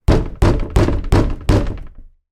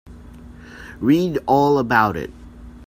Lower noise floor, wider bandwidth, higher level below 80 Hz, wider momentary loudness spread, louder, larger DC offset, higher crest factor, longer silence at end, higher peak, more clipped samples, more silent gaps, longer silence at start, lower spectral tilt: second, -36 dBFS vs -40 dBFS; second, 13 kHz vs 16 kHz; first, -20 dBFS vs -44 dBFS; second, 5 LU vs 19 LU; about the same, -17 LUFS vs -18 LUFS; neither; second, 14 dB vs 20 dB; first, 0.3 s vs 0 s; about the same, 0 dBFS vs 0 dBFS; neither; neither; about the same, 0.1 s vs 0.05 s; about the same, -7.5 dB/octave vs -7 dB/octave